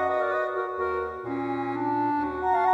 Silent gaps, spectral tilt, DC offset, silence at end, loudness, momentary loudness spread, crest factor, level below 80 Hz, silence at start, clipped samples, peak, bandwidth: none; -7.5 dB/octave; under 0.1%; 0 s; -28 LUFS; 5 LU; 16 dB; -56 dBFS; 0 s; under 0.1%; -12 dBFS; 7.8 kHz